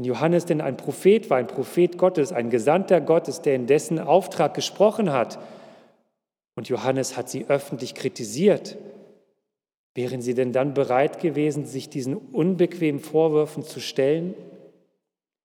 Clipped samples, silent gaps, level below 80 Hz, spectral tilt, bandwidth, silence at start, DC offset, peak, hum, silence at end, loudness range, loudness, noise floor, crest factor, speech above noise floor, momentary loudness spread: under 0.1%; 9.74-9.95 s; -84 dBFS; -6 dB/octave; 17.5 kHz; 0 s; under 0.1%; -4 dBFS; none; 0.85 s; 6 LU; -23 LUFS; -81 dBFS; 20 dB; 58 dB; 11 LU